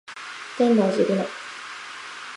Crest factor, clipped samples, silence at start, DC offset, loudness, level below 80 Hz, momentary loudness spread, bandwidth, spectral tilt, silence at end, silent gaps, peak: 18 dB; under 0.1%; 0.1 s; under 0.1%; -22 LUFS; -74 dBFS; 16 LU; 11.5 kHz; -5.5 dB/octave; 0 s; none; -6 dBFS